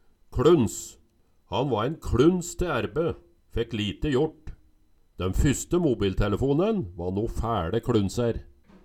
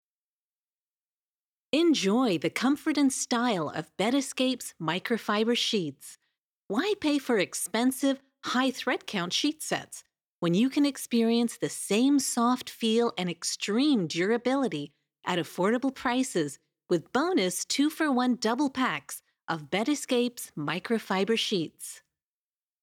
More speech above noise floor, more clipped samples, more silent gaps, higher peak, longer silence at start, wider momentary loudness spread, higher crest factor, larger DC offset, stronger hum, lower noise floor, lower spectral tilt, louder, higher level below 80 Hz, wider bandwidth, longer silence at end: second, 37 dB vs over 63 dB; neither; second, none vs 6.43-6.69 s, 10.28-10.42 s, 19.44-19.48 s; first, -8 dBFS vs -12 dBFS; second, 0.3 s vs 1.75 s; about the same, 11 LU vs 10 LU; about the same, 18 dB vs 16 dB; neither; neither; second, -62 dBFS vs under -90 dBFS; first, -6 dB/octave vs -4 dB/octave; about the same, -26 LUFS vs -28 LUFS; first, -38 dBFS vs -76 dBFS; about the same, 15 kHz vs 16.5 kHz; second, 0.4 s vs 0.9 s